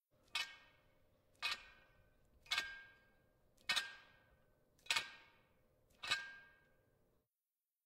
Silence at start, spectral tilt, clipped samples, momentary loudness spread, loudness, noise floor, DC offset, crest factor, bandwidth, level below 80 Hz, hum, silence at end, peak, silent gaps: 0.35 s; 1 dB/octave; under 0.1%; 21 LU; -43 LUFS; under -90 dBFS; under 0.1%; 30 dB; 16 kHz; -78 dBFS; none; 1.35 s; -18 dBFS; none